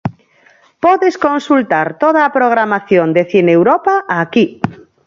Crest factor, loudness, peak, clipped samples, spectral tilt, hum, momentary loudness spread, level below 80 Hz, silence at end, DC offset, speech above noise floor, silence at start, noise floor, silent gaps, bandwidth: 12 dB; -12 LUFS; 0 dBFS; under 0.1%; -7 dB/octave; none; 5 LU; -52 dBFS; 0.3 s; under 0.1%; 37 dB; 0.05 s; -49 dBFS; none; 7.4 kHz